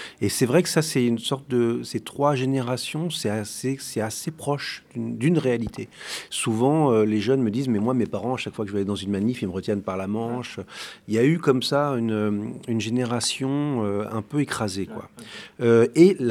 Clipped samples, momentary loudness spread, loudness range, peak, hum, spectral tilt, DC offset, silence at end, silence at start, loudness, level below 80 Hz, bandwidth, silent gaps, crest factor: under 0.1%; 12 LU; 4 LU; -4 dBFS; none; -5.5 dB/octave; under 0.1%; 0 s; 0 s; -24 LUFS; -60 dBFS; 16.5 kHz; none; 20 dB